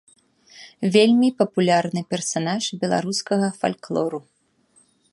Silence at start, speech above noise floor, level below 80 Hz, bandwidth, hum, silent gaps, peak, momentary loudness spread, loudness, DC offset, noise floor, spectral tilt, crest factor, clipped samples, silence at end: 0.55 s; 40 dB; -68 dBFS; 11.5 kHz; none; none; -4 dBFS; 9 LU; -21 LUFS; under 0.1%; -61 dBFS; -5 dB/octave; 20 dB; under 0.1%; 0.95 s